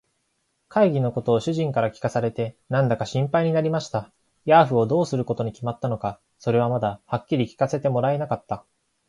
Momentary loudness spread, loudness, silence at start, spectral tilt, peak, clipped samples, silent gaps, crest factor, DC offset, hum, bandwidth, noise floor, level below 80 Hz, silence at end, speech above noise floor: 10 LU; -23 LUFS; 0.7 s; -7.5 dB/octave; -4 dBFS; under 0.1%; none; 20 dB; under 0.1%; none; 11 kHz; -72 dBFS; -58 dBFS; 0.5 s; 50 dB